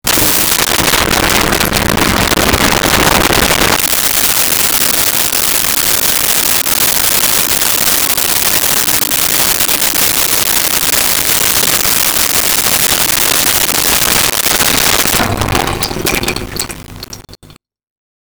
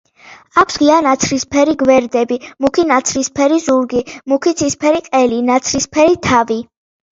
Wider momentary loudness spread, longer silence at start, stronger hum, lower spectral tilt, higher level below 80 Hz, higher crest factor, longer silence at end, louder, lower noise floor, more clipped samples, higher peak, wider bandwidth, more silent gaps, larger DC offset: about the same, 6 LU vs 6 LU; second, 0.05 s vs 0.25 s; neither; second, -1.5 dB/octave vs -3.5 dB/octave; first, -30 dBFS vs -46 dBFS; about the same, 12 dB vs 14 dB; first, 0.7 s vs 0.5 s; first, -8 LUFS vs -14 LUFS; about the same, -41 dBFS vs -42 dBFS; neither; about the same, 0 dBFS vs 0 dBFS; first, over 20 kHz vs 7.8 kHz; neither; neither